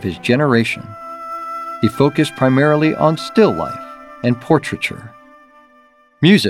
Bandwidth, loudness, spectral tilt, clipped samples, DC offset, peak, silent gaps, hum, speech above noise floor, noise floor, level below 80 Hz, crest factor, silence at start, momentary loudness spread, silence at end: 15 kHz; -16 LUFS; -6.5 dB/octave; under 0.1%; under 0.1%; 0 dBFS; none; none; 36 dB; -51 dBFS; -54 dBFS; 16 dB; 0 s; 14 LU; 0 s